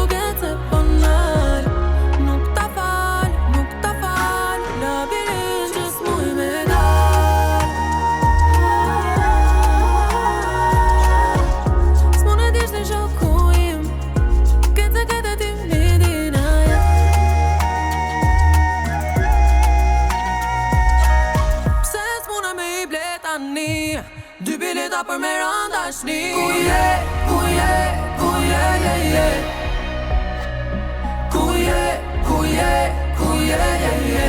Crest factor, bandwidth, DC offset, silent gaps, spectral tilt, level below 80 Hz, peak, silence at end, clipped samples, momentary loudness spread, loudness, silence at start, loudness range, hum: 10 dB; 17 kHz; under 0.1%; none; -5.5 dB/octave; -20 dBFS; -6 dBFS; 0 s; under 0.1%; 8 LU; -18 LUFS; 0 s; 5 LU; none